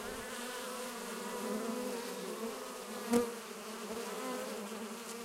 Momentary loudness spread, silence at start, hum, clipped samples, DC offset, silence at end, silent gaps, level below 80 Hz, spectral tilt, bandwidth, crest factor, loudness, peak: 9 LU; 0 s; none; under 0.1%; under 0.1%; 0 s; none; -70 dBFS; -3 dB/octave; 16 kHz; 26 dB; -40 LUFS; -14 dBFS